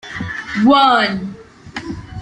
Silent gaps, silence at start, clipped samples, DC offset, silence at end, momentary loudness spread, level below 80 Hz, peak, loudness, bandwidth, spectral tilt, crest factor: none; 0.05 s; under 0.1%; under 0.1%; 0 s; 19 LU; -46 dBFS; -2 dBFS; -14 LUFS; 10 kHz; -5.5 dB/octave; 16 dB